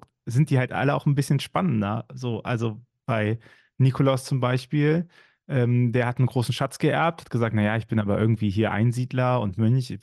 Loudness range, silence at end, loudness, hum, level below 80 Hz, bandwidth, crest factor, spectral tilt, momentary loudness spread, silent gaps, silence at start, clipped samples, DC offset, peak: 2 LU; 0.05 s; -24 LUFS; none; -60 dBFS; 12.5 kHz; 14 dB; -7 dB/octave; 7 LU; none; 0.25 s; under 0.1%; under 0.1%; -10 dBFS